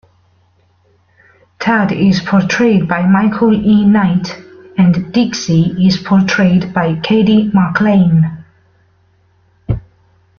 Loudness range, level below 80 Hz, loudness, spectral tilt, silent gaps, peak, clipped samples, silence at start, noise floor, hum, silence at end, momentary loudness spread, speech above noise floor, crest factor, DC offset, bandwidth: 2 LU; -42 dBFS; -12 LUFS; -7 dB/octave; none; 0 dBFS; under 0.1%; 1.6 s; -53 dBFS; none; 0.6 s; 11 LU; 43 dB; 12 dB; under 0.1%; 6.8 kHz